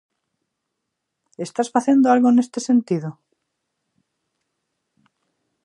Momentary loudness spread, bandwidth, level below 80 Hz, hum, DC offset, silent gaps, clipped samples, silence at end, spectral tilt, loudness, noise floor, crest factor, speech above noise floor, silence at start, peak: 15 LU; 11 kHz; -78 dBFS; none; under 0.1%; none; under 0.1%; 2.55 s; -6 dB/octave; -18 LUFS; -79 dBFS; 20 dB; 61 dB; 1.4 s; -2 dBFS